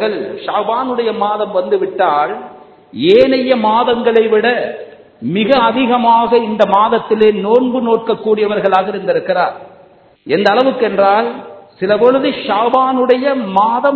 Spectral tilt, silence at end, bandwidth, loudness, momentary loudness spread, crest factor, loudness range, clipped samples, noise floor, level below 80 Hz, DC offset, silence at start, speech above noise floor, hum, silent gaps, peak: -7.5 dB/octave; 0 s; 6.6 kHz; -13 LUFS; 8 LU; 12 dB; 3 LU; 0.1%; -45 dBFS; -54 dBFS; under 0.1%; 0 s; 32 dB; none; none; 0 dBFS